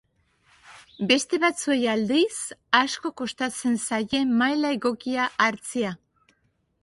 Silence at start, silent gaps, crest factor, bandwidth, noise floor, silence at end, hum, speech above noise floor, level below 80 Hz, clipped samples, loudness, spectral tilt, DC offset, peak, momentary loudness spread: 0.65 s; none; 22 dB; 11.5 kHz; -69 dBFS; 0.9 s; none; 45 dB; -64 dBFS; under 0.1%; -24 LUFS; -3 dB/octave; under 0.1%; -4 dBFS; 8 LU